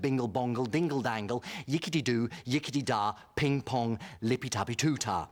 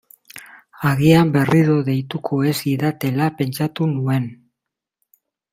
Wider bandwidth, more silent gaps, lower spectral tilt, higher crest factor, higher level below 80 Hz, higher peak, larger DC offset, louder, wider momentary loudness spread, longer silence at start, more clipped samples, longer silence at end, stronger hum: first, 19.5 kHz vs 16 kHz; neither; second, -5 dB/octave vs -7 dB/octave; about the same, 14 dB vs 18 dB; second, -64 dBFS vs -54 dBFS; second, -16 dBFS vs -2 dBFS; neither; second, -32 LUFS vs -18 LUFS; second, 5 LU vs 16 LU; second, 0 s vs 0.35 s; neither; second, 0.05 s vs 1.2 s; neither